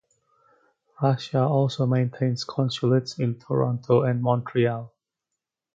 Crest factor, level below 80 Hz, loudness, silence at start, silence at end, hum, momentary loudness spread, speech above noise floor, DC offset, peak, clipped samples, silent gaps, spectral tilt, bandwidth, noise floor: 18 dB; -66 dBFS; -24 LUFS; 1 s; 0.9 s; none; 5 LU; 62 dB; under 0.1%; -6 dBFS; under 0.1%; none; -7.5 dB/octave; 7.6 kHz; -85 dBFS